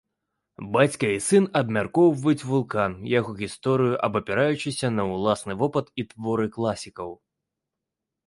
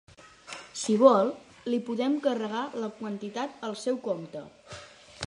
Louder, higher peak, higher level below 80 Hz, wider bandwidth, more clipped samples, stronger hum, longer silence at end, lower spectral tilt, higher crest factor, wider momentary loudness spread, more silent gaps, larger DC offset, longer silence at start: first, -24 LUFS vs -28 LUFS; about the same, -6 dBFS vs -4 dBFS; first, -58 dBFS vs -66 dBFS; about the same, 11.5 kHz vs 11.5 kHz; neither; neither; first, 1.15 s vs 0.05 s; about the same, -5.5 dB/octave vs -5 dB/octave; second, 18 dB vs 24 dB; second, 11 LU vs 23 LU; neither; neither; first, 0.6 s vs 0.25 s